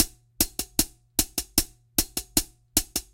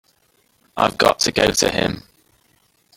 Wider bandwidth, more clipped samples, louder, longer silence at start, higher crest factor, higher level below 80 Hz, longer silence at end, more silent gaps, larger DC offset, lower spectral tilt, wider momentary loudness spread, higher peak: about the same, 17.5 kHz vs 17 kHz; neither; second, -26 LUFS vs -18 LUFS; second, 0 s vs 0.75 s; first, 26 dB vs 20 dB; first, -40 dBFS vs -46 dBFS; second, 0.15 s vs 0.95 s; neither; neither; second, -1.5 dB/octave vs -3 dB/octave; second, 2 LU vs 13 LU; about the same, -2 dBFS vs 0 dBFS